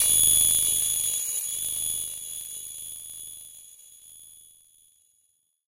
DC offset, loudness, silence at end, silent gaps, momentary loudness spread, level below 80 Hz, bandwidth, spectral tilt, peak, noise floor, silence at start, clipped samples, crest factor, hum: under 0.1%; -22 LUFS; 1.3 s; none; 22 LU; -58 dBFS; 17 kHz; 1.5 dB/octave; -12 dBFS; -70 dBFS; 0 s; under 0.1%; 18 dB; none